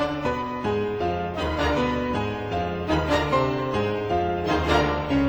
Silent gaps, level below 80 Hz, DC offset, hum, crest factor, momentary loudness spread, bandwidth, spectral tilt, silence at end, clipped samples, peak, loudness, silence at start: none; -38 dBFS; under 0.1%; none; 18 dB; 6 LU; over 20 kHz; -6.5 dB/octave; 0 s; under 0.1%; -6 dBFS; -25 LUFS; 0 s